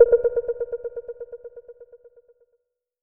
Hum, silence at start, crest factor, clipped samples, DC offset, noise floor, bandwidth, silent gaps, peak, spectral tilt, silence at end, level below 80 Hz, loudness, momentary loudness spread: none; 0 s; 22 dB; under 0.1%; under 0.1%; -73 dBFS; 2 kHz; none; -2 dBFS; -8 dB/octave; 1.3 s; -54 dBFS; -25 LUFS; 26 LU